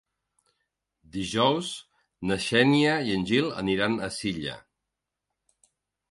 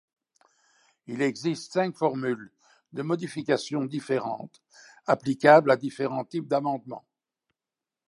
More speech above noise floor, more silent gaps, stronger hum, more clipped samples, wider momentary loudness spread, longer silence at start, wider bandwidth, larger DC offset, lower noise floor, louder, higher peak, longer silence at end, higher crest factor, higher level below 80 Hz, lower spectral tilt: second, 60 dB vs over 64 dB; neither; neither; neither; second, 15 LU vs 19 LU; about the same, 1.15 s vs 1.1 s; about the same, 11.5 kHz vs 11.5 kHz; neither; second, -85 dBFS vs under -90 dBFS; about the same, -26 LUFS vs -26 LUFS; second, -8 dBFS vs -4 dBFS; first, 1.5 s vs 1.1 s; about the same, 20 dB vs 24 dB; first, -58 dBFS vs -78 dBFS; about the same, -5 dB/octave vs -6 dB/octave